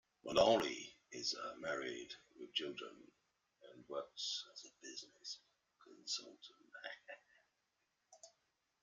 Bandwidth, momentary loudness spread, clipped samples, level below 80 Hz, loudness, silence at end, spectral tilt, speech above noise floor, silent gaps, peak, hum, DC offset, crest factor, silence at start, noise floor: 11.5 kHz; 24 LU; under 0.1%; -78 dBFS; -42 LUFS; 0.55 s; -2.5 dB/octave; 43 dB; none; -20 dBFS; none; under 0.1%; 26 dB; 0.25 s; -85 dBFS